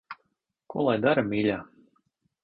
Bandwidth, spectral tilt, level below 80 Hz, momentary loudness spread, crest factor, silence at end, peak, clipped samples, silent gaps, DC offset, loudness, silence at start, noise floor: 5.4 kHz; -10 dB/octave; -62 dBFS; 20 LU; 18 dB; 0.8 s; -10 dBFS; under 0.1%; none; under 0.1%; -26 LUFS; 0.1 s; -76 dBFS